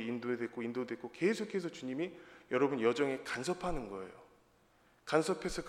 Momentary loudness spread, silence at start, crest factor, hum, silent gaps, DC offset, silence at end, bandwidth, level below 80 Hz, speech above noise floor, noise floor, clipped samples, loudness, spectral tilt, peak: 12 LU; 0 s; 22 dB; none; none; under 0.1%; 0 s; 14.5 kHz; -58 dBFS; 32 dB; -68 dBFS; under 0.1%; -36 LUFS; -5 dB/octave; -14 dBFS